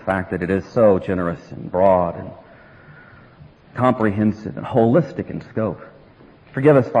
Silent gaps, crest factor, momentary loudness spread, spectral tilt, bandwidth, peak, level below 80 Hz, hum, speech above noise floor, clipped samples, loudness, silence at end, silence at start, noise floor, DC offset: none; 16 dB; 15 LU; -9.5 dB/octave; 10 kHz; -2 dBFS; -50 dBFS; none; 29 dB; under 0.1%; -19 LUFS; 0 s; 0 s; -47 dBFS; under 0.1%